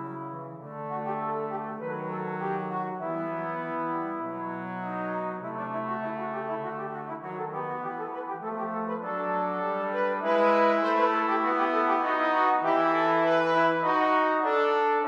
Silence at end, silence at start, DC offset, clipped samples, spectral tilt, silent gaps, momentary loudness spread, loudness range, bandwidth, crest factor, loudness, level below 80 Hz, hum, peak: 0 s; 0 s; under 0.1%; under 0.1%; -7 dB/octave; none; 11 LU; 9 LU; 7.6 kHz; 16 dB; -28 LUFS; -88 dBFS; none; -12 dBFS